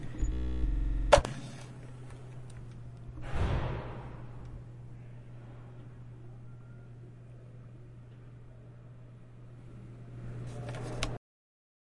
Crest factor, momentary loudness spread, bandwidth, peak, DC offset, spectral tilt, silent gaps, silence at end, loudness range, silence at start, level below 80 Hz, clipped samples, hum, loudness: 30 dB; 18 LU; 11.5 kHz; -6 dBFS; under 0.1%; -5.5 dB/octave; none; 0.7 s; 17 LU; 0 s; -40 dBFS; under 0.1%; none; -36 LUFS